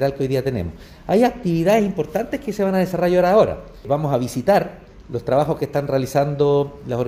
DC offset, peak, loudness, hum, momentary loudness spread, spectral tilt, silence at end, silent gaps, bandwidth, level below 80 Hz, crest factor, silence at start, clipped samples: under 0.1%; -4 dBFS; -19 LUFS; none; 10 LU; -7 dB/octave; 0 s; none; 16 kHz; -44 dBFS; 16 dB; 0 s; under 0.1%